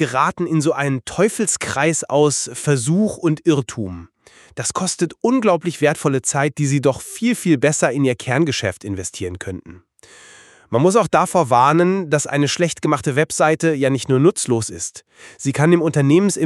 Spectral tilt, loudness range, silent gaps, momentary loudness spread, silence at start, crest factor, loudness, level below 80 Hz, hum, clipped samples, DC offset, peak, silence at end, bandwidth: -5 dB/octave; 4 LU; none; 11 LU; 0 s; 18 dB; -18 LUFS; -54 dBFS; none; under 0.1%; under 0.1%; 0 dBFS; 0 s; 13.5 kHz